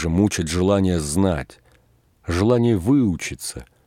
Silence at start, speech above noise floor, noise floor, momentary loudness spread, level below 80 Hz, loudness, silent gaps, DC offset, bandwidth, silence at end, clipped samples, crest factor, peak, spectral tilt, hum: 0 s; 39 dB; -58 dBFS; 13 LU; -40 dBFS; -20 LUFS; none; under 0.1%; 16 kHz; 0.25 s; under 0.1%; 16 dB; -4 dBFS; -6 dB/octave; none